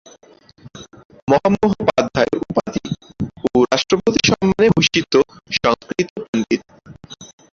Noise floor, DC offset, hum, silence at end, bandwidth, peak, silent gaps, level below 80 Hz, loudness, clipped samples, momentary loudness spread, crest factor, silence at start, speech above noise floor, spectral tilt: -49 dBFS; under 0.1%; none; 0.3 s; 7.6 kHz; -2 dBFS; 1.05-1.10 s, 1.22-1.27 s, 6.10-6.16 s, 6.28-6.33 s; -46 dBFS; -17 LUFS; under 0.1%; 14 LU; 16 dB; 0.65 s; 31 dB; -5 dB/octave